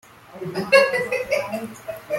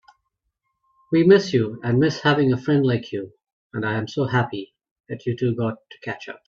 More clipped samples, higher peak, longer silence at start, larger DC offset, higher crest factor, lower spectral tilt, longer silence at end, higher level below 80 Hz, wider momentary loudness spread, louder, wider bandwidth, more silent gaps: neither; about the same, -2 dBFS vs -2 dBFS; second, 0.3 s vs 1.1 s; neither; about the same, 20 dB vs 20 dB; second, -3.5 dB/octave vs -7 dB/octave; about the same, 0 s vs 0.1 s; about the same, -60 dBFS vs -60 dBFS; about the same, 18 LU vs 17 LU; about the same, -21 LUFS vs -21 LUFS; first, 16.5 kHz vs 7.4 kHz; second, none vs 3.53-3.70 s, 4.91-5.04 s